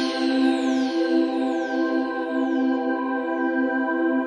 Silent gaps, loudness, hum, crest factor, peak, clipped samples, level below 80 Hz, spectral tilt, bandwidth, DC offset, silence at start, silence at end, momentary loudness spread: none; -23 LUFS; none; 12 dB; -10 dBFS; under 0.1%; -70 dBFS; -4 dB/octave; 10 kHz; under 0.1%; 0 s; 0 s; 4 LU